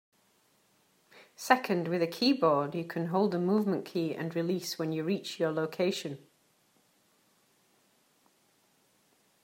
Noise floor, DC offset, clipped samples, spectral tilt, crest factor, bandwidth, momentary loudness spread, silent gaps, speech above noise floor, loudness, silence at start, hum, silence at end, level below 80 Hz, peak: -69 dBFS; under 0.1%; under 0.1%; -5.5 dB/octave; 26 dB; 16 kHz; 8 LU; none; 39 dB; -30 LUFS; 1.15 s; none; 3.25 s; -84 dBFS; -6 dBFS